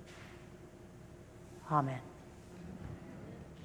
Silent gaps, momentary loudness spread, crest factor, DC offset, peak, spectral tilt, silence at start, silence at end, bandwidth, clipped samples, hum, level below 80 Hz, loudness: none; 20 LU; 28 dB; under 0.1%; -16 dBFS; -7.5 dB/octave; 0 s; 0 s; 20 kHz; under 0.1%; none; -62 dBFS; -41 LUFS